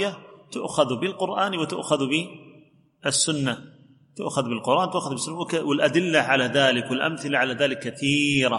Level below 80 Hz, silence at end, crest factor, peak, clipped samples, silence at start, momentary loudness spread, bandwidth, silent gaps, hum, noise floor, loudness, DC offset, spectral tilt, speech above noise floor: -64 dBFS; 0 s; 20 dB; -4 dBFS; under 0.1%; 0 s; 9 LU; 11.5 kHz; none; none; -55 dBFS; -23 LUFS; under 0.1%; -3.5 dB/octave; 31 dB